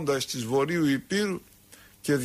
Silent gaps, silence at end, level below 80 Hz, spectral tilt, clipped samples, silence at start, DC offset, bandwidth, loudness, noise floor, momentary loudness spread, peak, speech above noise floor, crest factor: none; 0 s; -62 dBFS; -5 dB/octave; under 0.1%; 0 s; under 0.1%; 15.5 kHz; -28 LUFS; -54 dBFS; 9 LU; -14 dBFS; 27 dB; 14 dB